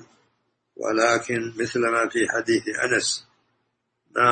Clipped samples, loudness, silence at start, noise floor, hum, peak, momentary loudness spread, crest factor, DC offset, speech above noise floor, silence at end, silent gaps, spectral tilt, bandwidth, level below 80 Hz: under 0.1%; -23 LUFS; 0.8 s; -75 dBFS; none; -4 dBFS; 8 LU; 20 dB; under 0.1%; 52 dB; 0 s; none; -3 dB/octave; 8.8 kHz; -66 dBFS